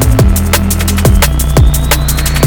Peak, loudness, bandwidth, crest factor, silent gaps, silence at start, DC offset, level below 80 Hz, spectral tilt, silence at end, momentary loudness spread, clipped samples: 0 dBFS; -10 LUFS; over 20 kHz; 8 dB; none; 0 s; under 0.1%; -12 dBFS; -4.5 dB/octave; 0 s; 2 LU; 0.2%